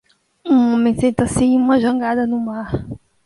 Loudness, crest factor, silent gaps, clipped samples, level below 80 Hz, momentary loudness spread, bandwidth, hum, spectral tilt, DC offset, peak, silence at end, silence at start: -17 LUFS; 14 dB; none; under 0.1%; -42 dBFS; 12 LU; 11.5 kHz; none; -6.5 dB/octave; under 0.1%; -2 dBFS; 0.3 s; 0.45 s